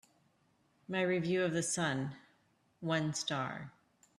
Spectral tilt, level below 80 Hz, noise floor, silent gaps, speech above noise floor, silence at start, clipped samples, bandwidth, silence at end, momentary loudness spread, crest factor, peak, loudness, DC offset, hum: -4.5 dB/octave; -76 dBFS; -73 dBFS; none; 38 dB; 0.9 s; under 0.1%; 13 kHz; 0.5 s; 11 LU; 18 dB; -20 dBFS; -35 LUFS; under 0.1%; none